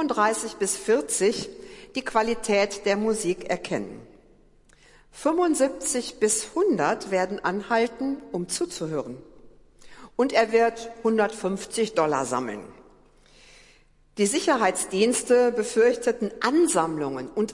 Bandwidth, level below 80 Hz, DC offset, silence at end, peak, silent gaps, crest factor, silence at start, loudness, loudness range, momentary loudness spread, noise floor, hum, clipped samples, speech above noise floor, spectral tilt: 11.5 kHz; -58 dBFS; under 0.1%; 0 s; -8 dBFS; none; 18 dB; 0 s; -24 LUFS; 5 LU; 10 LU; -57 dBFS; none; under 0.1%; 33 dB; -3.5 dB/octave